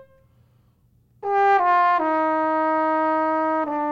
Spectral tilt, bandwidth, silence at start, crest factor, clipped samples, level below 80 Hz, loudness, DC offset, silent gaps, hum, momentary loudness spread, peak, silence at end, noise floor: -6 dB/octave; 7.2 kHz; 1.2 s; 14 dB; under 0.1%; -66 dBFS; -20 LUFS; under 0.1%; none; none; 6 LU; -8 dBFS; 0 s; -60 dBFS